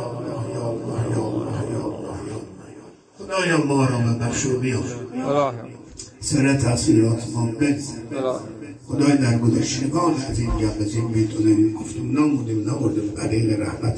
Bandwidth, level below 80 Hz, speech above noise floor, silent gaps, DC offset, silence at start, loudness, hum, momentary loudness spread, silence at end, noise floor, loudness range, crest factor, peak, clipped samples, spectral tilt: 10.5 kHz; -42 dBFS; 23 dB; none; under 0.1%; 0 s; -22 LUFS; none; 13 LU; 0 s; -44 dBFS; 3 LU; 16 dB; -4 dBFS; under 0.1%; -6 dB/octave